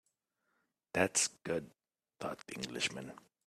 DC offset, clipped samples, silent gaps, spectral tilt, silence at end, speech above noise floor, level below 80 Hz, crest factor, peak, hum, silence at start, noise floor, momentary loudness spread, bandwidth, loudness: under 0.1%; under 0.1%; none; -2 dB/octave; 0.3 s; 45 dB; -74 dBFS; 26 dB; -14 dBFS; none; 0.95 s; -83 dBFS; 14 LU; 15 kHz; -36 LUFS